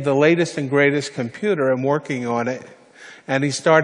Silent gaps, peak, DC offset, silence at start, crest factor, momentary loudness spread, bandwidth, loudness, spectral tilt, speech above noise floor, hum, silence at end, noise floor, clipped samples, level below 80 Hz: none; -2 dBFS; under 0.1%; 0 s; 18 dB; 10 LU; 10.5 kHz; -20 LUFS; -5.5 dB/octave; 25 dB; none; 0 s; -44 dBFS; under 0.1%; -68 dBFS